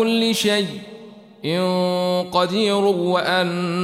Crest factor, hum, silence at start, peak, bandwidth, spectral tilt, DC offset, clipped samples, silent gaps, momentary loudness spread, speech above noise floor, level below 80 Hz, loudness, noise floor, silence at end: 16 dB; none; 0 s; -4 dBFS; 16 kHz; -5 dB/octave; under 0.1%; under 0.1%; none; 9 LU; 22 dB; -64 dBFS; -20 LUFS; -42 dBFS; 0 s